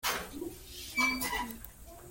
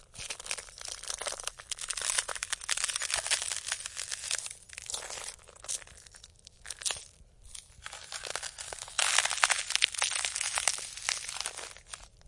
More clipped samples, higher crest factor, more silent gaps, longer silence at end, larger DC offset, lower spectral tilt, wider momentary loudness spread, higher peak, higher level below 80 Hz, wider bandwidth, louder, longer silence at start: neither; second, 20 dB vs 34 dB; neither; about the same, 0 s vs 0.1 s; neither; first, -2 dB/octave vs 2.5 dB/octave; about the same, 18 LU vs 19 LU; second, -18 dBFS vs -2 dBFS; first, -54 dBFS vs -62 dBFS; first, 17 kHz vs 11.5 kHz; about the same, -34 LUFS vs -32 LUFS; about the same, 0.05 s vs 0 s